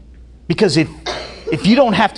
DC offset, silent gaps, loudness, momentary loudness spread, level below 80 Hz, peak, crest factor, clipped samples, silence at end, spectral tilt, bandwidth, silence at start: under 0.1%; none; -16 LUFS; 13 LU; -40 dBFS; 0 dBFS; 16 dB; under 0.1%; 0 s; -5.5 dB/octave; 11 kHz; 0.2 s